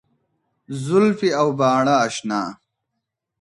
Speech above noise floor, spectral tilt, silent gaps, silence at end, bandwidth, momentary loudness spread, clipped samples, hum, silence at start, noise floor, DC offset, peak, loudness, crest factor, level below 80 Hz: 61 dB; -5.5 dB/octave; none; 0.9 s; 11.5 kHz; 13 LU; under 0.1%; none; 0.7 s; -79 dBFS; under 0.1%; -4 dBFS; -19 LUFS; 18 dB; -66 dBFS